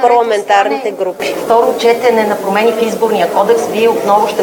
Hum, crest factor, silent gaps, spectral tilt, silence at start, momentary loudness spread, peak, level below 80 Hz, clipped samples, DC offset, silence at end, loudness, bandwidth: none; 12 dB; none; -4 dB/octave; 0 s; 6 LU; 0 dBFS; -56 dBFS; 0.1%; under 0.1%; 0 s; -12 LUFS; 19 kHz